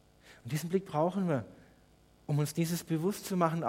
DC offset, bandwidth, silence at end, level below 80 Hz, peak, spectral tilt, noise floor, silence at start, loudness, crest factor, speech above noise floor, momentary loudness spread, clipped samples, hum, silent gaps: under 0.1%; 16.5 kHz; 0 s; -68 dBFS; -14 dBFS; -6.5 dB/octave; -63 dBFS; 0.25 s; -33 LUFS; 20 dB; 31 dB; 11 LU; under 0.1%; 50 Hz at -55 dBFS; none